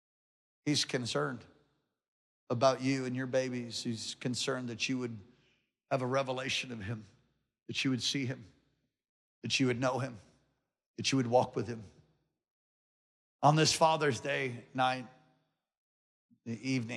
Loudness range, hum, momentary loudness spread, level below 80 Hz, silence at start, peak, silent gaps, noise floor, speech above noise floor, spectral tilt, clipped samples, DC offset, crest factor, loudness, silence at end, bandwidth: 5 LU; none; 14 LU; -76 dBFS; 0.65 s; -12 dBFS; 2.08-2.47 s, 9.09-9.42 s, 10.86-10.94 s, 12.51-13.39 s, 15.77-16.29 s; -79 dBFS; 46 dB; -4.5 dB/octave; under 0.1%; under 0.1%; 24 dB; -33 LUFS; 0 s; 13 kHz